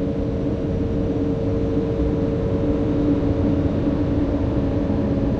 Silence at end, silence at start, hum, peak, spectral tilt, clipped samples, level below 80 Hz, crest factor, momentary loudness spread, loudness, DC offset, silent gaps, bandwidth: 0 s; 0 s; none; -8 dBFS; -10 dB/octave; under 0.1%; -30 dBFS; 12 dB; 3 LU; -22 LUFS; under 0.1%; none; 6.8 kHz